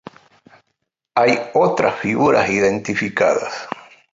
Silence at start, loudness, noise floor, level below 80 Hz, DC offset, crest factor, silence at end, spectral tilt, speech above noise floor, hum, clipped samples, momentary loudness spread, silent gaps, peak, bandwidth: 1.15 s; -17 LUFS; -74 dBFS; -56 dBFS; under 0.1%; 18 dB; 0.35 s; -5 dB/octave; 57 dB; none; under 0.1%; 12 LU; none; -2 dBFS; 7.8 kHz